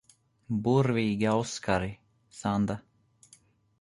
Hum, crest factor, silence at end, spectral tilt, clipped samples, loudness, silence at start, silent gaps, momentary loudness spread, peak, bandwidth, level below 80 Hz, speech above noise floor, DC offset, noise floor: none; 18 dB; 1 s; -6.5 dB/octave; under 0.1%; -29 LUFS; 0.5 s; none; 10 LU; -12 dBFS; 11.5 kHz; -56 dBFS; 34 dB; under 0.1%; -62 dBFS